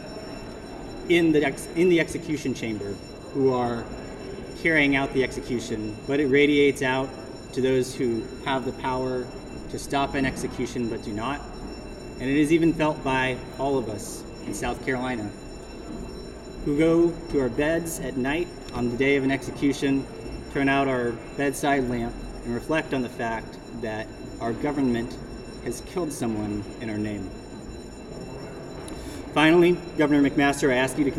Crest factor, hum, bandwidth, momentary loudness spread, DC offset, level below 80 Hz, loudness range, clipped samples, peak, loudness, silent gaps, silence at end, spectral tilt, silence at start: 22 dB; none; 14 kHz; 17 LU; under 0.1%; -44 dBFS; 7 LU; under 0.1%; -4 dBFS; -25 LUFS; none; 0 s; -5.5 dB/octave; 0 s